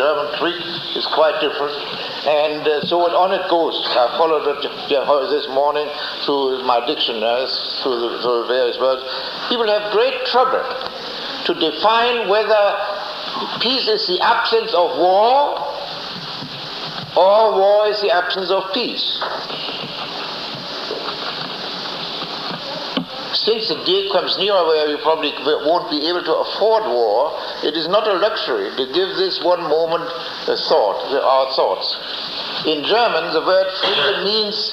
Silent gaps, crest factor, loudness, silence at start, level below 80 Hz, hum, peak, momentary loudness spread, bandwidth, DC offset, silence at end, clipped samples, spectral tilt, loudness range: none; 16 dB; -18 LUFS; 0 s; -60 dBFS; none; -2 dBFS; 9 LU; 15 kHz; under 0.1%; 0 s; under 0.1%; -4.5 dB/octave; 4 LU